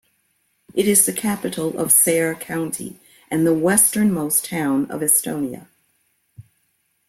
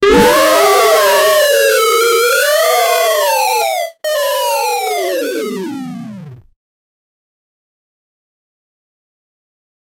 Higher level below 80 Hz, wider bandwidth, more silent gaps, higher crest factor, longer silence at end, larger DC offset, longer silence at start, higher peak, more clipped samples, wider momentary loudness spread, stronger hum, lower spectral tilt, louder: second, -60 dBFS vs -44 dBFS; about the same, 16.5 kHz vs 18 kHz; neither; first, 22 dB vs 14 dB; second, 0.7 s vs 3.65 s; neither; first, 0.75 s vs 0 s; about the same, 0 dBFS vs 0 dBFS; neither; about the same, 13 LU vs 12 LU; neither; first, -3.5 dB/octave vs -2 dB/octave; second, -18 LUFS vs -11 LUFS